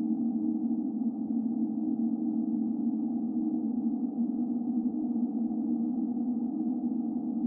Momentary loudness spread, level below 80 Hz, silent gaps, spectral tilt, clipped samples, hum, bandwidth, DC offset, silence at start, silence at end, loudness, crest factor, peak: 1 LU; -76 dBFS; none; -14 dB/octave; under 0.1%; none; 1.3 kHz; under 0.1%; 0 s; 0 s; -31 LUFS; 10 dB; -20 dBFS